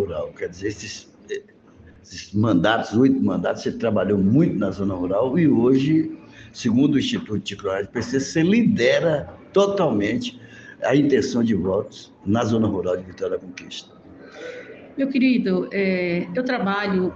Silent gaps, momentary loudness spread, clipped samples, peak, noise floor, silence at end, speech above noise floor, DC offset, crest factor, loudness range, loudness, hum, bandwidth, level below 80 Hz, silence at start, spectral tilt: none; 17 LU; under 0.1%; -4 dBFS; -40 dBFS; 0 s; 19 dB; under 0.1%; 18 dB; 5 LU; -21 LUFS; none; 8 kHz; -54 dBFS; 0 s; -6.5 dB/octave